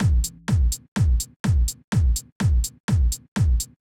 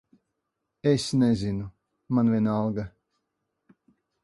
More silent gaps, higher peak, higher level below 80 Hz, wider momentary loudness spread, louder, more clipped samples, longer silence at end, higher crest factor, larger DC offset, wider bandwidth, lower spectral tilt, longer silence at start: first, 0.88-0.96 s, 1.36-1.44 s, 1.84-1.92 s, 2.32-2.40 s, 2.80-2.88 s, 3.28-3.36 s vs none; about the same, -12 dBFS vs -10 dBFS; first, -24 dBFS vs -54 dBFS; second, 2 LU vs 12 LU; first, -23 LUFS vs -26 LUFS; neither; second, 0.2 s vs 1.35 s; second, 10 dB vs 18 dB; neither; first, 17 kHz vs 11.5 kHz; second, -5 dB/octave vs -7 dB/octave; second, 0 s vs 0.85 s